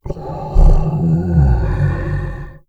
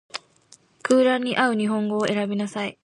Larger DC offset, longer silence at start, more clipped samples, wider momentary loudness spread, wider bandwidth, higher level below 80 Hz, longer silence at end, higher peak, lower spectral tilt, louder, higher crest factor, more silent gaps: first, 0.5% vs under 0.1%; about the same, 0.05 s vs 0.15 s; neither; second, 11 LU vs 14 LU; second, 4.8 kHz vs 11.5 kHz; first, -16 dBFS vs -70 dBFS; about the same, 0.1 s vs 0.15 s; first, 0 dBFS vs -6 dBFS; first, -10 dB/octave vs -5 dB/octave; first, -17 LUFS vs -22 LUFS; about the same, 14 dB vs 18 dB; neither